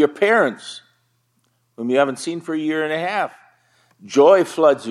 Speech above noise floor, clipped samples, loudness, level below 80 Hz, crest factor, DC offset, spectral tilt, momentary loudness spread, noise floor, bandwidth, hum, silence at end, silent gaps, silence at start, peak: 48 dB; under 0.1%; -18 LUFS; -78 dBFS; 18 dB; under 0.1%; -4.5 dB/octave; 16 LU; -66 dBFS; 12.5 kHz; none; 0 s; none; 0 s; -2 dBFS